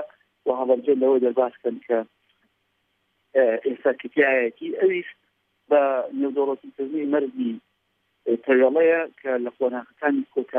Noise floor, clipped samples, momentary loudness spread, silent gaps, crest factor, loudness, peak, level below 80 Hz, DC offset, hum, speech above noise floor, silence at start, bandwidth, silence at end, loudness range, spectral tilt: -72 dBFS; under 0.1%; 11 LU; none; 18 dB; -23 LUFS; -6 dBFS; -84 dBFS; under 0.1%; none; 50 dB; 0 s; 3.7 kHz; 0 s; 2 LU; -8.5 dB/octave